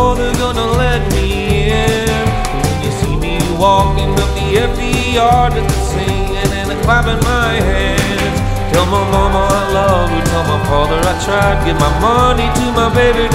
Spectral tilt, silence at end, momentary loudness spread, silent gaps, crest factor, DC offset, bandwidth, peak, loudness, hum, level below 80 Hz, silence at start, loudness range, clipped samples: -5 dB/octave; 0 s; 5 LU; none; 12 dB; under 0.1%; 16 kHz; 0 dBFS; -13 LUFS; none; -20 dBFS; 0 s; 1 LU; under 0.1%